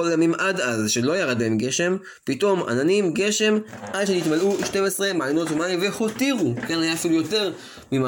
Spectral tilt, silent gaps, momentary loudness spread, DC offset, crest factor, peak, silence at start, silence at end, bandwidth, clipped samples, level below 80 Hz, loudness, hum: -4 dB/octave; none; 5 LU; under 0.1%; 14 dB; -8 dBFS; 0 s; 0 s; 17 kHz; under 0.1%; -62 dBFS; -22 LUFS; none